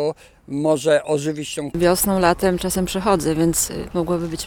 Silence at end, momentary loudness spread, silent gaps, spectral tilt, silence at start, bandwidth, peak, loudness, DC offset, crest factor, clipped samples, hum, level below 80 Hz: 0 s; 9 LU; none; -4.5 dB/octave; 0 s; over 20 kHz; -2 dBFS; -20 LUFS; under 0.1%; 18 dB; under 0.1%; none; -40 dBFS